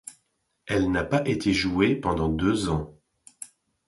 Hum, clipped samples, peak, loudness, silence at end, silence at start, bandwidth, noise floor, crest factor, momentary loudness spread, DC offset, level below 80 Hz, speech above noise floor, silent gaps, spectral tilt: none; under 0.1%; -8 dBFS; -25 LUFS; 0.4 s; 0.05 s; 11.5 kHz; -73 dBFS; 18 dB; 19 LU; under 0.1%; -44 dBFS; 49 dB; none; -6 dB/octave